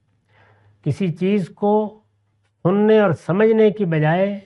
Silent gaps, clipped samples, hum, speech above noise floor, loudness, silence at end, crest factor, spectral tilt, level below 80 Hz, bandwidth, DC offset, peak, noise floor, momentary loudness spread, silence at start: none; under 0.1%; none; 48 dB; -18 LUFS; 0.05 s; 16 dB; -8.5 dB/octave; -62 dBFS; 9.6 kHz; under 0.1%; -4 dBFS; -65 dBFS; 9 LU; 0.85 s